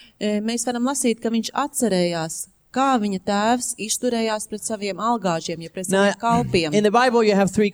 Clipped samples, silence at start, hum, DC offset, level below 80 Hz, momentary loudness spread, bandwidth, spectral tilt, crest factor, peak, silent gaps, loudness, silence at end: under 0.1%; 0.2 s; none; under 0.1%; -54 dBFS; 9 LU; over 20 kHz; -4 dB/octave; 18 dB; -4 dBFS; none; -21 LUFS; 0 s